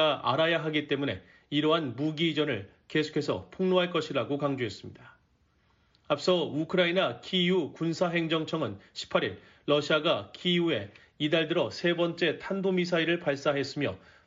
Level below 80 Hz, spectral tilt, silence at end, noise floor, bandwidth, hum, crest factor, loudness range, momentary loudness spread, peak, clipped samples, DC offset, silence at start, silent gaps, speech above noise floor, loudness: -68 dBFS; -3.5 dB/octave; 0.3 s; -68 dBFS; 7.6 kHz; none; 18 dB; 3 LU; 8 LU; -12 dBFS; under 0.1%; under 0.1%; 0 s; none; 39 dB; -29 LUFS